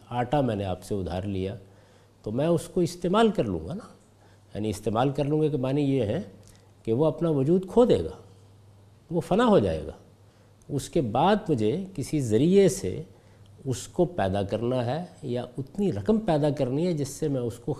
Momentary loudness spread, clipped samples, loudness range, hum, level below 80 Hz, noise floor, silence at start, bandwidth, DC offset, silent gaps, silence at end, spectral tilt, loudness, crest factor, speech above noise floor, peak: 13 LU; under 0.1%; 3 LU; none; -50 dBFS; -56 dBFS; 0.1 s; 14.5 kHz; under 0.1%; none; 0 s; -7 dB/octave; -26 LUFS; 18 dB; 30 dB; -8 dBFS